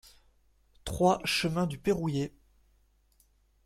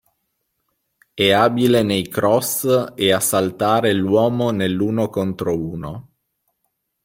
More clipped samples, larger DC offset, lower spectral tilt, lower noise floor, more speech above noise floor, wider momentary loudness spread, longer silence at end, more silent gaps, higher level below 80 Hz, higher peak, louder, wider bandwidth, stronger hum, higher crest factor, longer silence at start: neither; neither; about the same, -5 dB/octave vs -4.5 dB/octave; second, -67 dBFS vs -73 dBFS; second, 38 dB vs 55 dB; first, 13 LU vs 9 LU; first, 1.35 s vs 1.05 s; neither; about the same, -54 dBFS vs -54 dBFS; second, -12 dBFS vs -2 dBFS; second, -30 LUFS vs -18 LUFS; about the same, 15.5 kHz vs 16.5 kHz; neither; about the same, 20 dB vs 18 dB; second, 0.85 s vs 1.15 s